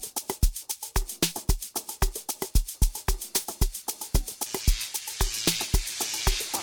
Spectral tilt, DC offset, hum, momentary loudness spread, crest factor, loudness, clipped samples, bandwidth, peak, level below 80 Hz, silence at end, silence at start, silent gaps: -2.5 dB/octave; under 0.1%; none; 6 LU; 18 dB; -29 LUFS; under 0.1%; 19 kHz; -8 dBFS; -30 dBFS; 0 s; 0 s; none